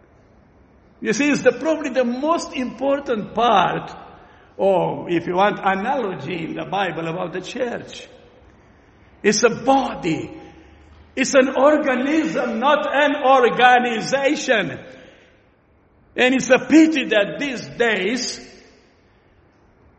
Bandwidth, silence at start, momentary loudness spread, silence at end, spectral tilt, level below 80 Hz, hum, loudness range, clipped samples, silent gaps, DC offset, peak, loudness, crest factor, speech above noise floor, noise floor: 8.4 kHz; 1 s; 13 LU; 1.5 s; -4 dB/octave; -56 dBFS; none; 6 LU; under 0.1%; none; under 0.1%; -2 dBFS; -19 LUFS; 20 dB; 38 dB; -56 dBFS